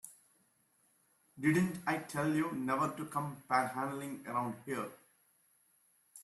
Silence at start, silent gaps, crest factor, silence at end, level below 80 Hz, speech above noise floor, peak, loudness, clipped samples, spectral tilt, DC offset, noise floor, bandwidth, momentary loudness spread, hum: 0.05 s; none; 22 dB; 0 s; -76 dBFS; 38 dB; -16 dBFS; -36 LUFS; under 0.1%; -6 dB/octave; under 0.1%; -73 dBFS; 13.5 kHz; 9 LU; none